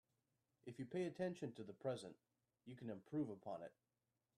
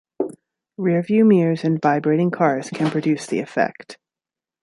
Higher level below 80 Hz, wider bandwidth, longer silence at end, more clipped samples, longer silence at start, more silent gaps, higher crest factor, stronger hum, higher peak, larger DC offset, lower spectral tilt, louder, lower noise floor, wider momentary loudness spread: second, -88 dBFS vs -68 dBFS; about the same, 12.5 kHz vs 11.5 kHz; about the same, 0.65 s vs 0.7 s; neither; first, 0.65 s vs 0.2 s; neither; about the same, 20 dB vs 16 dB; neither; second, -32 dBFS vs -4 dBFS; neither; about the same, -7 dB/octave vs -7.5 dB/octave; second, -49 LUFS vs -20 LUFS; about the same, under -90 dBFS vs -90 dBFS; about the same, 14 LU vs 12 LU